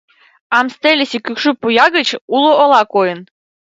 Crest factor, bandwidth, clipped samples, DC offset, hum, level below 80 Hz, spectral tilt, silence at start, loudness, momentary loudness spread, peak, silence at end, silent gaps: 14 dB; 8 kHz; under 0.1%; under 0.1%; none; -64 dBFS; -3.5 dB/octave; 0.5 s; -13 LUFS; 7 LU; 0 dBFS; 0.55 s; 2.21-2.28 s